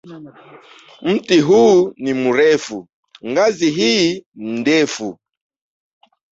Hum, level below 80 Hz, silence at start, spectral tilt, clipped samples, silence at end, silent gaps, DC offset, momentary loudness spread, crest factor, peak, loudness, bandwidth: none; -60 dBFS; 0.05 s; -4.5 dB/octave; under 0.1%; 1.2 s; 2.93-3.03 s, 4.26-4.32 s; under 0.1%; 16 LU; 14 dB; -2 dBFS; -15 LUFS; 8 kHz